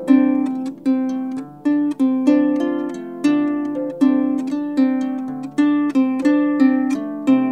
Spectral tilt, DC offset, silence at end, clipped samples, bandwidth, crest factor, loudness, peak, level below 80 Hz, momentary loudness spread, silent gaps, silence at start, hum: -6.5 dB/octave; 0.1%; 0 s; under 0.1%; 9.2 kHz; 14 dB; -19 LUFS; -2 dBFS; -66 dBFS; 8 LU; none; 0 s; none